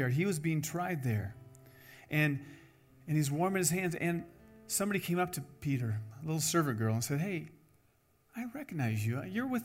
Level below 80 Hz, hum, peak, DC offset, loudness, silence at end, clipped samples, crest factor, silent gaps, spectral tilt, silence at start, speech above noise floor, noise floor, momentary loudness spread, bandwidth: -68 dBFS; none; -16 dBFS; under 0.1%; -34 LUFS; 0 s; under 0.1%; 18 dB; none; -5 dB/octave; 0 s; 37 dB; -70 dBFS; 13 LU; 16 kHz